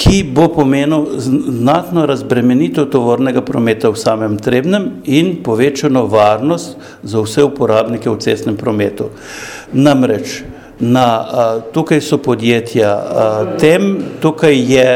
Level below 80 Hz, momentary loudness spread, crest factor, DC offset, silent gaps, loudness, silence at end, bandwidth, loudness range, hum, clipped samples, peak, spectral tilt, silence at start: -34 dBFS; 8 LU; 12 dB; under 0.1%; none; -13 LUFS; 0 s; 16 kHz; 2 LU; none; 0.1%; 0 dBFS; -6 dB/octave; 0 s